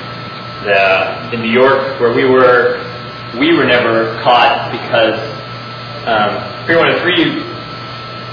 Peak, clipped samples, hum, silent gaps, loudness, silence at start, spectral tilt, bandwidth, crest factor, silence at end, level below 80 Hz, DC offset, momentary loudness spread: 0 dBFS; under 0.1%; none; none; -12 LUFS; 0 s; -6.5 dB/octave; 5.4 kHz; 14 dB; 0 s; -48 dBFS; under 0.1%; 16 LU